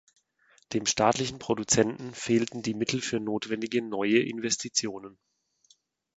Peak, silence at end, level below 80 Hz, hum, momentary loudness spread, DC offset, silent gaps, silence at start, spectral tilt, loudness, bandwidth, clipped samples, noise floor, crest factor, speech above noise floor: -8 dBFS; 1.05 s; -62 dBFS; none; 7 LU; under 0.1%; none; 0.7 s; -3.5 dB/octave; -28 LUFS; 9 kHz; under 0.1%; -66 dBFS; 22 dB; 38 dB